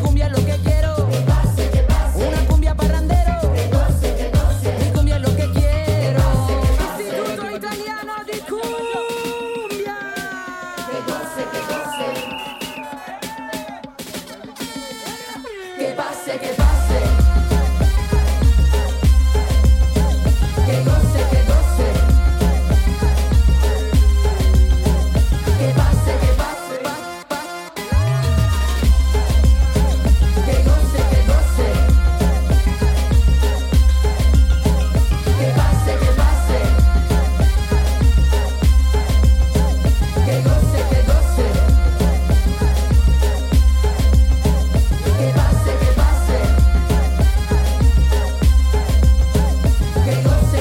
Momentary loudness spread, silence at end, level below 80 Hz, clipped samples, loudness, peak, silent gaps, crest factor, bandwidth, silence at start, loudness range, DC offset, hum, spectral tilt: 11 LU; 0 s; -16 dBFS; under 0.1%; -17 LUFS; -4 dBFS; none; 12 dB; 16 kHz; 0 s; 9 LU; under 0.1%; none; -6 dB/octave